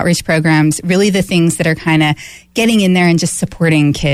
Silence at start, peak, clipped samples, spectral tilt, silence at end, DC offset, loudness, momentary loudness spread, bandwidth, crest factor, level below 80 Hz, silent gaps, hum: 0 s; -2 dBFS; under 0.1%; -5 dB/octave; 0 s; under 0.1%; -12 LUFS; 5 LU; 15 kHz; 10 dB; -40 dBFS; none; none